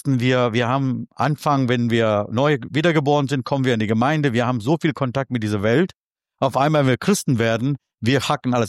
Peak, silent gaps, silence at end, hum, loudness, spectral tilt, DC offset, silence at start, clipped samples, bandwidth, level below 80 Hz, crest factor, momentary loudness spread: -4 dBFS; 5.96-6.11 s; 0 s; none; -20 LUFS; -6 dB/octave; under 0.1%; 0.05 s; under 0.1%; 14 kHz; -58 dBFS; 16 dB; 5 LU